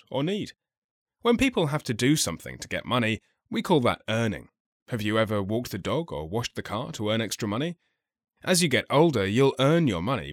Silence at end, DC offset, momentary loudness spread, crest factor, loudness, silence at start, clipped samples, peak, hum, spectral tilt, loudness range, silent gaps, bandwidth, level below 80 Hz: 0 s; under 0.1%; 11 LU; 18 dB; -26 LUFS; 0.1 s; under 0.1%; -8 dBFS; none; -5 dB/octave; 5 LU; 0.77-1.06 s, 4.60-4.86 s; 16.5 kHz; -54 dBFS